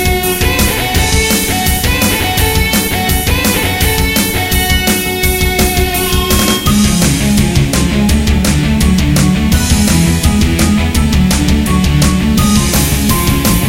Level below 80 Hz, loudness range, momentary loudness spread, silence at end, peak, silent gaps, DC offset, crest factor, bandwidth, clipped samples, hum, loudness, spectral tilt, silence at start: -16 dBFS; 1 LU; 2 LU; 0 s; 0 dBFS; none; under 0.1%; 10 dB; 17 kHz; under 0.1%; none; -11 LUFS; -4 dB/octave; 0 s